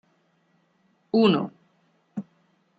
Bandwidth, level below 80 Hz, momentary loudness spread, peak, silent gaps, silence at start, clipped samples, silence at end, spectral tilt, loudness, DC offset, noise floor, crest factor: 7.8 kHz; -70 dBFS; 18 LU; -6 dBFS; none; 1.15 s; under 0.1%; 0.55 s; -8 dB/octave; -23 LUFS; under 0.1%; -67 dBFS; 22 dB